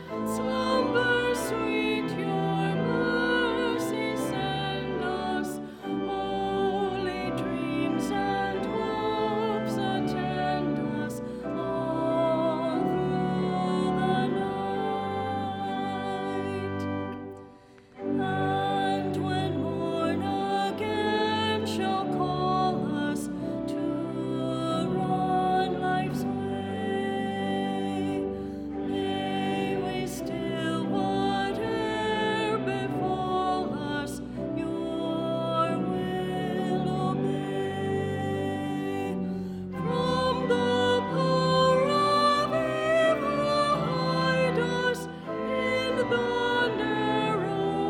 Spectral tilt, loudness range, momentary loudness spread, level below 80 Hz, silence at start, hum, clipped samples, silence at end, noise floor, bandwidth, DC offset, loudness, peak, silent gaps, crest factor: -6 dB/octave; 5 LU; 7 LU; -54 dBFS; 0 s; none; under 0.1%; 0 s; -52 dBFS; 17 kHz; under 0.1%; -28 LUFS; -12 dBFS; none; 16 dB